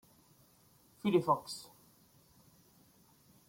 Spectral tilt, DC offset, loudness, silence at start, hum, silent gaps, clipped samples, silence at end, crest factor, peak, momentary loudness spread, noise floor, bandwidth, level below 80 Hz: -6 dB/octave; under 0.1%; -34 LUFS; 1.05 s; none; none; under 0.1%; 1.85 s; 22 dB; -18 dBFS; 17 LU; -66 dBFS; 16.5 kHz; -78 dBFS